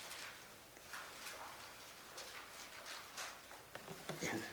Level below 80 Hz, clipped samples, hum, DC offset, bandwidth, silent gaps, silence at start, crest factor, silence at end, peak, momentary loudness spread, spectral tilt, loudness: -78 dBFS; under 0.1%; none; under 0.1%; over 20 kHz; none; 0 s; 24 dB; 0 s; -28 dBFS; 9 LU; -2.5 dB/octave; -50 LUFS